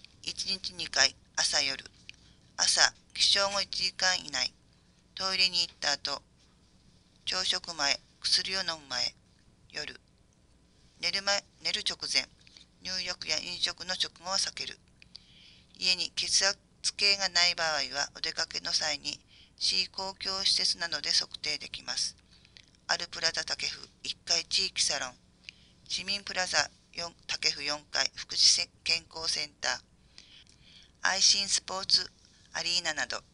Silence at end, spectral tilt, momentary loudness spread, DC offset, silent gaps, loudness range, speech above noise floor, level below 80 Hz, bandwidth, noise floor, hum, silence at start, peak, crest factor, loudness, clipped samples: 0.15 s; 0.5 dB/octave; 13 LU; under 0.1%; none; 5 LU; 33 dB; -64 dBFS; 11.5 kHz; -64 dBFS; none; 0.25 s; -4 dBFS; 28 dB; -28 LUFS; under 0.1%